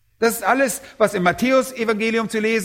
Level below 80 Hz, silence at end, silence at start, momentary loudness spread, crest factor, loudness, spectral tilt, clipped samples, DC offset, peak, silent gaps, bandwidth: -56 dBFS; 0 s; 0.2 s; 3 LU; 16 dB; -19 LUFS; -4 dB/octave; under 0.1%; under 0.1%; -2 dBFS; none; 16.5 kHz